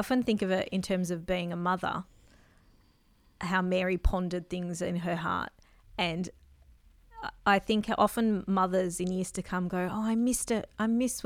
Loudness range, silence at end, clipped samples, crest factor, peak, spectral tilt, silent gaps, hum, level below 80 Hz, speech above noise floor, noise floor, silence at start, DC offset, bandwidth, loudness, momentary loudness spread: 4 LU; 0 s; under 0.1%; 20 dB; -12 dBFS; -5 dB/octave; none; none; -46 dBFS; 35 dB; -64 dBFS; 0 s; under 0.1%; 16 kHz; -30 LUFS; 9 LU